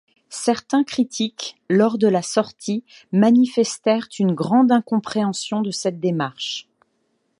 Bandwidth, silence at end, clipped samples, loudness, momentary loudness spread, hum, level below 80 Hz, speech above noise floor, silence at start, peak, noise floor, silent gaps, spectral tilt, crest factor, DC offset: 11.5 kHz; 0.8 s; under 0.1%; -20 LUFS; 11 LU; none; -68 dBFS; 49 dB; 0.3 s; -4 dBFS; -69 dBFS; none; -5 dB/octave; 16 dB; under 0.1%